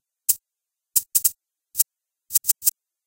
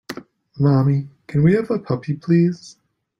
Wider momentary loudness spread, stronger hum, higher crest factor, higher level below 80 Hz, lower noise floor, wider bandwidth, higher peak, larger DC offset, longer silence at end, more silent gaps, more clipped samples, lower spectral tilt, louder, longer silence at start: second, 5 LU vs 14 LU; neither; first, 24 dB vs 16 dB; second, -74 dBFS vs -54 dBFS; first, -86 dBFS vs -37 dBFS; first, 17.5 kHz vs 7.4 kHz; about the same, -2 dBFS vs -4 dBFS; neither; second, 0.35 s vs 0.5 s; neither; neither; second, 3 dB/octave vs -9 dB/octave; about the same, -21 LUFS vs -19 LUFS; first, 0.3 s vs 0.1 s